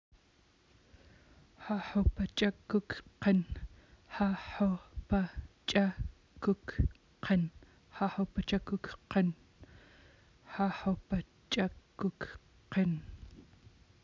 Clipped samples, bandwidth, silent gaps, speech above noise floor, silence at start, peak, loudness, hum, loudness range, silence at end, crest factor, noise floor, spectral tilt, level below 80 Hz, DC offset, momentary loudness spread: under 0.1%; 7.6 kHz; none; 34 dB; 1.6 s; -14 dBFS; -35 LUFS; none; 3 LU; 0.6 s; 22 dB; -67 dBFS; -7 dB/octave; -46 dBFS; under 0.1%; 14 LU